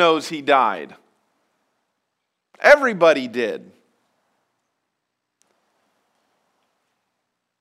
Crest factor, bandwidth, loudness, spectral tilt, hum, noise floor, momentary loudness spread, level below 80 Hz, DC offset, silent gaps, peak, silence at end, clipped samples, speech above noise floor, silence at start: 22 dB; 14 kHz; -17 LUFS; -4 dB/octave; none; -78 dBFS; 18 LU; -66 dBFS; under 0.1%; none; 0 dBFS; 4.05 s; under 0.1%; 61 dB; 0 s